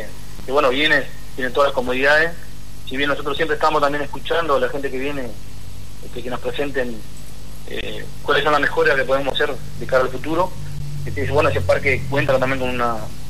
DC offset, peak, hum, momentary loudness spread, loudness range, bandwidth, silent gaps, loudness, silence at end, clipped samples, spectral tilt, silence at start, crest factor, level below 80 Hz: 7%; -4 dBFS; 50 Hz at -40 dBFS; 19 LU; 6 LU; 13.5 kHz; none; -20 LUFS; 0 s; under 0.1%; -5 dB/octave; 0 s; 16 dB; -40 dBFS